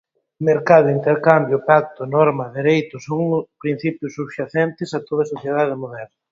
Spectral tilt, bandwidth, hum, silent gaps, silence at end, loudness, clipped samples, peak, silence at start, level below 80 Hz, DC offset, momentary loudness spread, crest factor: -7.5 dB/octave; 7.6 kHz; none; none; 0.25 s; -18 LUFS; under 0.1%; 0 dBFS; 0.4 s; -62 dBFS; under 0.1%; 14 LU; 18 dB